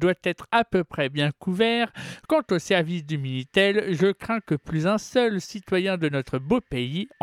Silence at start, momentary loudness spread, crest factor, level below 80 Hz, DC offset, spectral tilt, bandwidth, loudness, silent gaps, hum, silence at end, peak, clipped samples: 0 s; 7 LU; 18 dB; -54 dBFS; under 0.1%; -6 dB/octave; 14 kHz; -24 LUFS; none; none; 0.15 s; -6 dBFS; under 0.1%